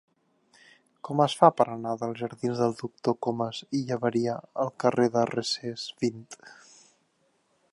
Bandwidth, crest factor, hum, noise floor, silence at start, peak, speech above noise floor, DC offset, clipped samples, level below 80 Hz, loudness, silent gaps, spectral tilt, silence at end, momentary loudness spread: 11.5 kHz; 24 dB; none; -70 dBFS; 1.05 s; -4 dBFS; 43 dB; under 0.1%; under 0.1%; -72 dBFS; -27 LUFS; none; -5.5 dB/octave; 1.2 s; 12 LU